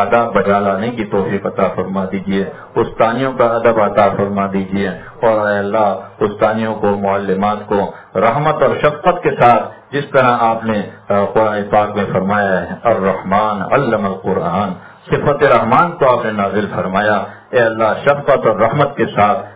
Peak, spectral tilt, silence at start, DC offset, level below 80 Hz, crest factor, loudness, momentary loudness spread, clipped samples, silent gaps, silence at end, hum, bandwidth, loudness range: 0 dBFS; -10.5 dB/octave; 0 s; under 0.1%; -46 dBFS; 14 dB; -15 LUFS; 7 LU; under 0.1%; none; 0 s; none; 4 kHz; 2 LU